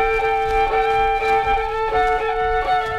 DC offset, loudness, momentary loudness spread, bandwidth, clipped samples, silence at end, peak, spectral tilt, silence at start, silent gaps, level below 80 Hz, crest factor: under 0.1%; -19 LUFS; 2 LU; 12.5 kHz; under 0.1%; 0 s; -8 dBFS; -4 dB/octave; 0 s; none; -32 dBFS; 10 dB